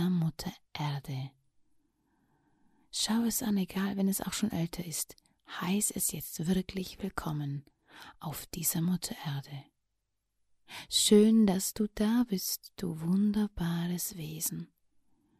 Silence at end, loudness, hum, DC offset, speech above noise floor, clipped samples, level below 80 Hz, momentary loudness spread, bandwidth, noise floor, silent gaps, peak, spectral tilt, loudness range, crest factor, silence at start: 0.75 s; -31 LUFS; none; under 0.1%; 52 dB; under 0.1%; -58 dBFS; 14 LU; 15.5 kHz; -83 dBFS; none; -10 dBFS; -4.5 dB/octave; 8 LU; 22 dB; 0 s